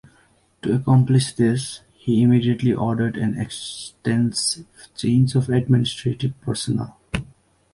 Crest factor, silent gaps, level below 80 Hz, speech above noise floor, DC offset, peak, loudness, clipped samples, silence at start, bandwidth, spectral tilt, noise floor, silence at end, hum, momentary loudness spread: 16 dB; none; -48 dBFS; 38 dB; under 0.1%; -4 dBFS; -21 LUFS; under 0.1%; 0.65 s; 11.5 kHz; -6 dB/octave; -58 dBFS; 0.5 s; none; 13 LU